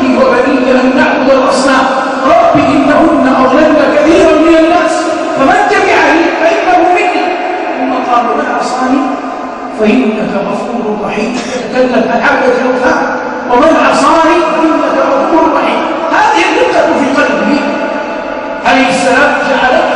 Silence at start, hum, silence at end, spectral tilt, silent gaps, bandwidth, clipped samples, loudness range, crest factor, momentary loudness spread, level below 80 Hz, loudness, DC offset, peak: 0 s; none; 0 s; -4.5 dB/octave; none; 11 kHz; 0.4%; 5 LU; 8 dB; 8 LU; -40 dBFS; -9 LUFS; under 0.1%; 0 dBFS